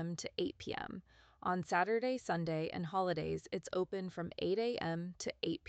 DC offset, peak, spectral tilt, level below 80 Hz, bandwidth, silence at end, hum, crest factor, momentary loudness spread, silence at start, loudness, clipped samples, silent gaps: under 0.1%; -18 dBFS; -5.5 dB/octave; -68 dBFS; 9 kHz; 0.1 s; none; 20 dB; 9 LU; 0 s; -38 LUFS; under 0.1%; none